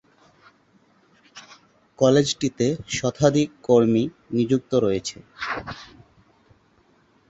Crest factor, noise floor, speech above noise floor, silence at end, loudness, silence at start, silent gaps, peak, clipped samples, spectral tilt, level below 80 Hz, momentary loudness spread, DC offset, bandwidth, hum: 20 dB; -60 dBFS; 39 dB; 1.45 s; -22 LUFS; 1.35 s; none; -4 dBFS; under 0.1%; -5.5 dB/octave; -56 dBFS; 16 LU; under 0.1%; 8.2 kHz; none